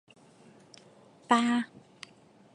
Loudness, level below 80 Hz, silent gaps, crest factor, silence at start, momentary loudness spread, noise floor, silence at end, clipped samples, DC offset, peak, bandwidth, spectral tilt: -28 LUFS; -84 dBFS; none; 26 dB; 1.3 s; 24 LU; -59 dBFS; 0.9 s; under 0.1%; under 0.1%; -8 dBFS; 10.5 kHz; -3.5 dB/octave